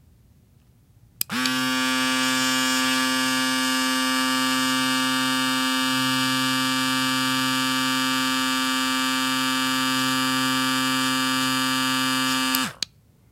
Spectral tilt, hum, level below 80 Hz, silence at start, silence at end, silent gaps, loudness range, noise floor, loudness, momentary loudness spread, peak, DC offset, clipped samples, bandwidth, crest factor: -1.5 dB/octave; none; -62 dBFS; 1.3 s; 0.45 s; none; 1 LU; -56 dBFS; -21 LUFS; 1 LU; -2 dBFS; under 0.1%; under 0.1%; 16 kHz; 22 dB